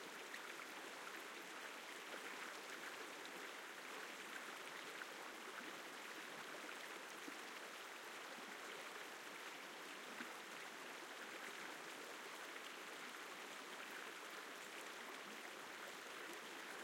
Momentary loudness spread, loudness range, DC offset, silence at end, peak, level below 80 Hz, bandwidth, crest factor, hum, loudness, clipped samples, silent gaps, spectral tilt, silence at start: 1 LU; 1 LU; under 0.1%; 0 s; -34 dBFS; under -90 dBFS; 16.5 kHz; 20 dB; none; -52 LUFS; under 0.1%; none; -1 dB/octave; 0 s